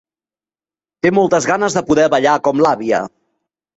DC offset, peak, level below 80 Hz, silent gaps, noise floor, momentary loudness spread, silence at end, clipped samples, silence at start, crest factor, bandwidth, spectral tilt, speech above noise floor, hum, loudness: under 0.1%; -2 dBFS; -54 dBFS; none; under -90 dBFS; 6 LU; 0.7 s; under 0.1%; 1.05 s; 14 dB; 8.2 kHz; -5 dB/octave; over 76 dB; none; -14 LUFS